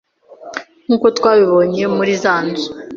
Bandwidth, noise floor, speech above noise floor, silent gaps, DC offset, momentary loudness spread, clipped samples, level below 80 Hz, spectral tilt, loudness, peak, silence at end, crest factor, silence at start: 7.6 kHz; -37 dBFS; 23 dB; none; under 0.1%; 17 LU; under 0.1%; -56 dBFS; -5.5 dB/octave; -14 LUFS; -2 dBFS; 0 s; 14 dB; 0.3 s